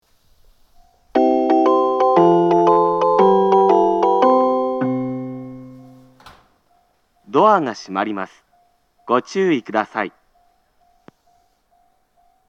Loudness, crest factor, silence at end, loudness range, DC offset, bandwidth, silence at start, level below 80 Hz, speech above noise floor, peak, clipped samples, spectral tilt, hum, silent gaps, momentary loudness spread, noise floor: -16 LUFS; 18 dB; 2.4 s; 10 LU; under 0.1%; 7.2 kHz; 1.15 s; -60 dBFS; 40 dB; 0 dBFS; under 0.1%; -7 dB/octave; none; none; 14 LU; -61 dBFS